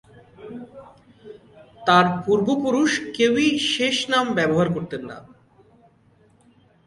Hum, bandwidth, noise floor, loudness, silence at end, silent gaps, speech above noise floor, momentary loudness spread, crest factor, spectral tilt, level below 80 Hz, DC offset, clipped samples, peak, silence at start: none; 11.5 kHz; -57 dBFS; -20 LUFS; 1.65 s; none; 37 dB; 21 LU; 20 dB; -4.5 dB/octave; -60 dBFS; under 0.1%; under 0.1%; -4 dBFS; 0.4 s